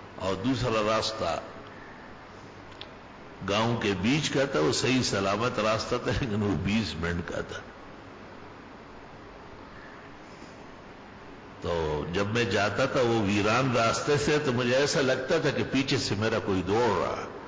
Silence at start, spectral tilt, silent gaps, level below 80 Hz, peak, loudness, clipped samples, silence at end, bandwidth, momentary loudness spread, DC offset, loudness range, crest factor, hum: 0 s; -5 dB/octave; none; -48 dBFS; -16 dBFS; -27 LUFS; under 0.1%; 0 s; 8 kHz; 21 LU; under 0.1%; 17 LU; 12 dB; none